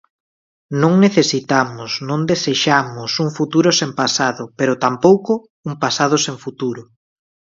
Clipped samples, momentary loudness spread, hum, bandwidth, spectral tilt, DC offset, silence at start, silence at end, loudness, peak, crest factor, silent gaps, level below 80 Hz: under 0.1%; 11 LU; none; 7.8 kHz; -4.5 dB/octave; under 0.1%; 0.7 s; 0.65 s; -17 LUFS; 0 dBFS; 18 dB; 5.50-5.63 s; -60 dBFS